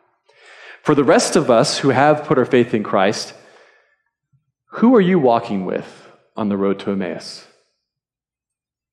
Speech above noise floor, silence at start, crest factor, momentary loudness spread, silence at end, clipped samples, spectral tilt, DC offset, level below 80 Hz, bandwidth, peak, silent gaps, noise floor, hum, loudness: over 74 dB; 0.65 s; 16 dB; 16 LU; 1.5 s; under 0.1%; -5 dB/octave; under 0.1%; -62 dBFS; 13 kHz; -2 dBFS; none; under -90 dBFS; none; -16 LUFS